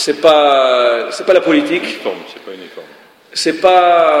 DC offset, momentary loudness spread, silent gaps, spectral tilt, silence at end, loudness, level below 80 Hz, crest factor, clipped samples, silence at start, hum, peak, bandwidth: under 0.1%; 21 LU; none; -3 dB/octave; 0 s; -12 LUFS; -60 dBFS; 12 dB; under 0.1%; 0 s; none; 0 dBFS; 15 kHz